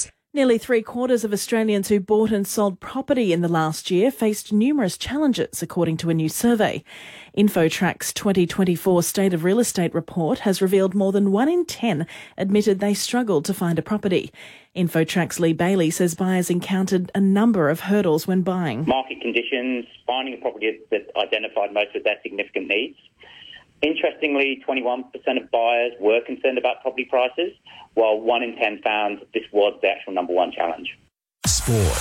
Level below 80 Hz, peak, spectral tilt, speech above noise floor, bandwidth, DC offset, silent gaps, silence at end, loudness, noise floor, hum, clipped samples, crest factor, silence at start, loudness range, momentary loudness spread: -46 dBFS; -8 dBFS; -5 dB/octave; 24 dB; 17 kHz; under 0.1%; none; 0 s; -21 LUFS; -45 dBFS; none; under 0.1%; 14 dB; 0 s; 4 LU; 7 LU